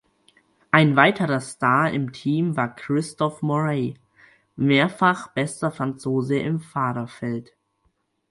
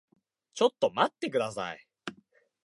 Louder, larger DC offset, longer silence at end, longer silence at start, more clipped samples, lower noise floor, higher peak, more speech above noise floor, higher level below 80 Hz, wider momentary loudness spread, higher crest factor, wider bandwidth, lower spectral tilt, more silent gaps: first, -22 LUFS vs -29 LUFS; neither; first, 0.9 s vs 0.55 s; first, 0.75 s vs 0.55 s; neither; first, -69 dBFS vs -64 dBFS; first, 0 dBFS vs -10 dBFS; first, 47 dB vs 36 dB; first, -62 dBFS vs -76 dBFS; second, 10 LU vs 17 LU; about the same, 22 dB vs 22 dB; about the same, 11.5 kHz vs 11.5 kHz; first, -6 dB/octave vs -4 dB/octave; neither